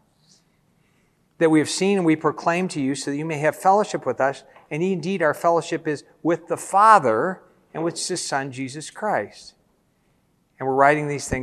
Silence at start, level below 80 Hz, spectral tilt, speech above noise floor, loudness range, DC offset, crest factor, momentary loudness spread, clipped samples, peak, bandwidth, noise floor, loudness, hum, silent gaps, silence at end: 1.4 s; -54 dBFS; -5 dB/octave; 43 dB; 6 LU; under 0.1%; 22 dB; 12 LU; under 0.1%; 0 dBFS; 13 kHz; -64 dBFS; -21 LUFS; none; none; 0 s